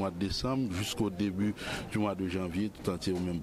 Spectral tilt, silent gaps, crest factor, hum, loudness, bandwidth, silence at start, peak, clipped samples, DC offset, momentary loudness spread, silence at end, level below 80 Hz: -5.5 dB/octave; none; 16 dB; none; -33 LUFS; 15 kHz; 0 s; -18 dBFS; under 0.1%; under 0.1%; 3 LU; 0 s; -52 dBFS